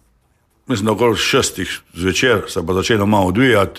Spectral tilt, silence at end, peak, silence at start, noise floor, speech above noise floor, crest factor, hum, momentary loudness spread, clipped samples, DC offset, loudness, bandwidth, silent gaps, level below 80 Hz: -4.5 dB/octave; 0 s; -2 dBFS; 0.7 s; -60 dBFS; 44 dB; 14 dB; none; 8 LU; under 0.1%; under 0.1%; -16 LUFS; 15.5 kHz; none; -44 dBFS